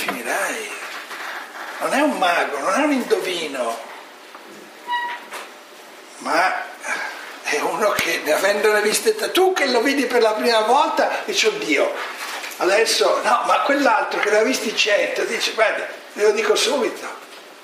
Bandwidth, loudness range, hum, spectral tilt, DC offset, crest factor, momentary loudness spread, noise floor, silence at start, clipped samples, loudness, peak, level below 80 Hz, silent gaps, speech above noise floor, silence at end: 15.5 kHz; 8 LU; none; -1.5 dB/octave; under 0.1%; 20 dB; 15 LU; -41 dBFS; 0 s; under 0.1%; -19 LUFS; 0 dBFS; -70 dBFS; none; 23 dB; 0 s